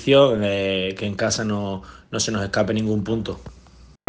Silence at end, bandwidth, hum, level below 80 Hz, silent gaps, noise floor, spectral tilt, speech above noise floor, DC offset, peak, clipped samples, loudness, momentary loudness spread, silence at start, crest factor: 0.55 s; 10 kHz; none; -48 dBFS; none; -48 dBFS; -4.5 dB/octave; 27 dB; under 0.1%; 0 dBFS; under 0.1%; -22 LUFS; 14 LU; 0 s; 22 dB